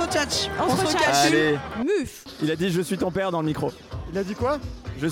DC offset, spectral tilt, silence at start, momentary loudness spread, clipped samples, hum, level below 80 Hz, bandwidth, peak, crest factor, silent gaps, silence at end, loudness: under 0.1%; -4 dB/octave; 0 s; 12 LU; under 0.1%; none; -44 dBFS; 17 kHz; -8 dBFS; 16 dB; none; 0 s; -24 LUFS